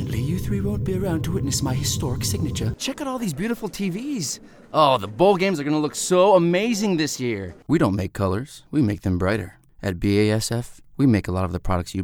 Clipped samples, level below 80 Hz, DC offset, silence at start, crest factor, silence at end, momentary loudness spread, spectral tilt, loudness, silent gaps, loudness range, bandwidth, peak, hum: under 0.1%; -42 dBFS; under 0.1%; 0 s; 18 dB; 0 s; 9 LU; -5.5 dB/octave; -22 LUFS; none; 5 LU; 18.5 kHz; -4 dBFS; none